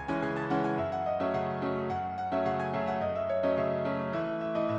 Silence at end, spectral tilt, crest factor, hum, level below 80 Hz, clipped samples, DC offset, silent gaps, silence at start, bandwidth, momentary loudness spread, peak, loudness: 0 s; -8 dB/octave; 14 dB; none; -62 dBFS; under 0.1%; under 0.1%; none; 0 s; 7.8 kHz; 3 LU; -16 dBFS; -31 LUFS